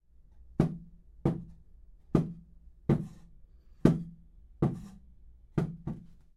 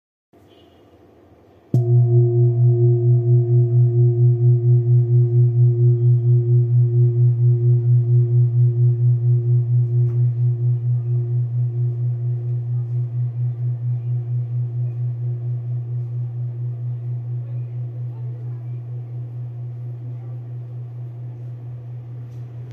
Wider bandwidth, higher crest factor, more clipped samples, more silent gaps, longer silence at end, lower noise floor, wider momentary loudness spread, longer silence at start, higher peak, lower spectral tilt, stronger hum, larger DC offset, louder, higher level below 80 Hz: first, 11 kHz vs 0.9 kHz; first, 28 dB vs 12 dB; neither; neither; first, 0.25 s vs 0 s; first, -55 dBFS vs -50 dBFS; first, 19 LU vs 16 LU; second, 0.45 s vs 1.75 s; about the same, -6 dBFS vs -6 dBFS; second, -9.5 dB/octave vs -13.5 dB/octave; neither; neither; second, -33 LUFS vs -19 LUFS; first, -50 dBFS vs -64 dBFS